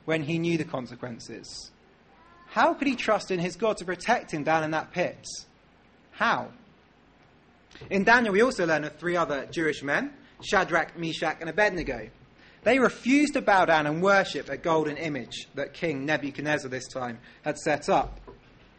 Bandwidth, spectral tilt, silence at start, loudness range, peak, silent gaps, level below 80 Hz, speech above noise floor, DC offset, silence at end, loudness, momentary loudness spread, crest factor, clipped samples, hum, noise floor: 8.8 kHz; -5 dB/octave; 0.05 s; 6 LU; -8 dBFS; none; -56 dBFS; 32 dB; under 0.1%; 0.45 s; -26 LUFS; 15 LU; 20 dB; under 0.1%; none; -58 dBFS